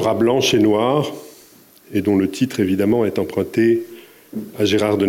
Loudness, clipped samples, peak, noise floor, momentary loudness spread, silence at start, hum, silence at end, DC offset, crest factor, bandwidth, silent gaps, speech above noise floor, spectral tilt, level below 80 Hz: -18 LUFS; under 0.1%; -6 dBFS; -48 dBFS; 16 LU; 0 s; none; 0 s; under 0.1%; 12 dB; 17 kHz; none; 30 dB; -5.5 dB/octave; -60 dBFS